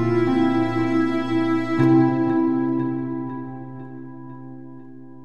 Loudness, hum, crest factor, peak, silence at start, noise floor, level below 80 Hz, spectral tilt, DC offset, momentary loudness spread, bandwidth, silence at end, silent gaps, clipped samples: -21 LUFS; none; 16 dB; -6 dBFS; 0 s; -41 dBFS; -60 dBFS; -8.5 dB/octave; 0.7%; 21 LU; 6.6 kHz; 0 s; none; under 0.1%